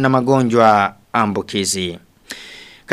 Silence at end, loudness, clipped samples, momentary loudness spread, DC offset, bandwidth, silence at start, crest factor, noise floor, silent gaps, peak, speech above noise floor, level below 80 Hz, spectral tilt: 0 s; -16 LUFS; under 0.1%; 21 LU; under 0.1%; 15 kHz; 0 s; 16 dB; -39 dBFS; none; 0 dBFS; 24 dB; -54 dBFS; -4.5 dB/octave